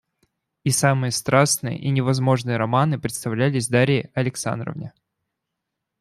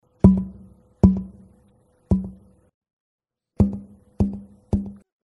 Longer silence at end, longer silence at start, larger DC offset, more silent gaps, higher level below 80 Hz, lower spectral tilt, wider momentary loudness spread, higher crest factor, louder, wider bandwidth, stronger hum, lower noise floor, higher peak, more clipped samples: first, 1.1 s vs 0.3 s; first, 0.65 s vs 0.25 s; neither; second, none vs 2.74-2.81 s, 2.93-3.18 s; second, -58 dBFS vs -34 dBFS; second, -5 dB/octave vs -11.5 dB/octave; second, 9 LU vs 21 LU; about the same, 20 dB vs 24 dB; about the same, -21 LUFS vs -22 LUFS; first, 14.5 kHz vs 2.6 kHz; neither; first, -81 dBFS vs -59 dBFS; about the same, -2 dBFS vs 0 dBFS; neither